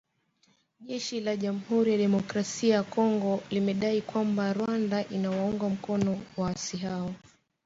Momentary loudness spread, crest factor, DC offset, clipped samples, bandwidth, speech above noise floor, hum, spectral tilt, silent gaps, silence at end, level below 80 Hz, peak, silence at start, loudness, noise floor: 8 LU; 16 dB; under 0.1%; under 0.1%; 7.8 kHz; 41 dB; none; -6 dB/octave; none; 0.5 s; -64 dBFS; -14 dBFS; 0.8 s; -29 LUFS; -69 dBFS